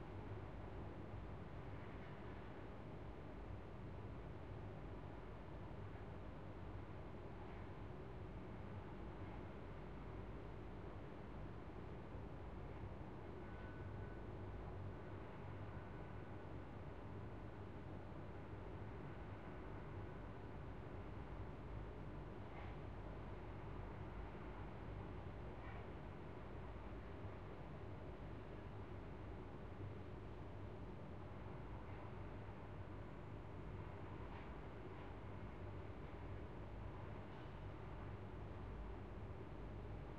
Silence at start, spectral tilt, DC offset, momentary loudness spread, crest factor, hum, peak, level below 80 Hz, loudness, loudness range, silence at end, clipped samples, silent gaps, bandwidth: 0 s; -8.5 dB/octave; 0.1%; 2 LU; 14 dB; none; -38 dBFS; -58 dBFS; -54 LUFS; 1 LU; 0 s; under 0.1%; none; 8 kHz